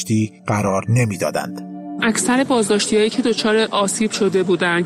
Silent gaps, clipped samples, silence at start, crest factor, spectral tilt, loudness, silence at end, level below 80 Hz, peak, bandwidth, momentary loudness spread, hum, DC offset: none; under 0.1%; 0 s; 14 dB; -4.5 dB/octave; -18 LUFS; 0 s; -54 dBFS; -4 dBFS; 15.5 kHz; 6 LU; none; under 0.1%